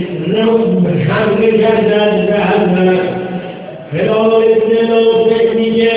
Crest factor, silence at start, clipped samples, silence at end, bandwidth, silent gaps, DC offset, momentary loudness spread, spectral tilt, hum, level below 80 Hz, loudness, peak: 12 dB; 0 s; under 0.1%; 0 s; 4 kHz; none; under 0.1%; 9 LU; -11 dB/octave; none; -46 dBFS; -11 LUFS; 0 dBFS